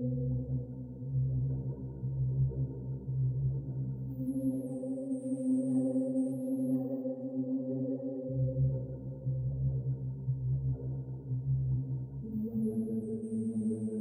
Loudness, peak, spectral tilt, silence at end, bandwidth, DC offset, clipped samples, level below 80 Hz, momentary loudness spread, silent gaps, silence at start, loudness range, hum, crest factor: -35 LUFS; -22 dBFS; -12.5 dB/octave; 0 s; 11.5 kHz; under 0.1%; under 0.1%; -50 dBFS; 7 LU; none; 0 s; 2 LU; none; 12 dB